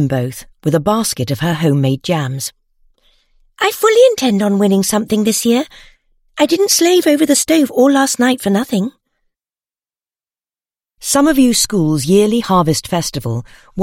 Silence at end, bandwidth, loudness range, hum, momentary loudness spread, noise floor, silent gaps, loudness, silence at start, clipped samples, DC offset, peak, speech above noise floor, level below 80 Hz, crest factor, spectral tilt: 0 s; 16.5 kHz; 5 LU; none; 11 LU; under -90 dBFS; none; -14 LUFS; 0 s; under 0.1%; under 0.1%; 0 dBFS; over 77 dB; -46 dBFS; 14 dB; -4.5 dB/octave